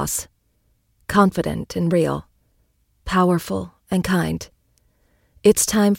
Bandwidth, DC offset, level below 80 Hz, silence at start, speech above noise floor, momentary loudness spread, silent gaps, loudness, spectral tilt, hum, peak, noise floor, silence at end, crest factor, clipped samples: 17 kHz; under 0.1%; -44 dBFS; 0 s; 46 dB; 14 LU; none; -20 LUFS; -5 dB/octave; none; -2 dBFS; -64 dBFS; 0 s; 20 dB; under 0.1%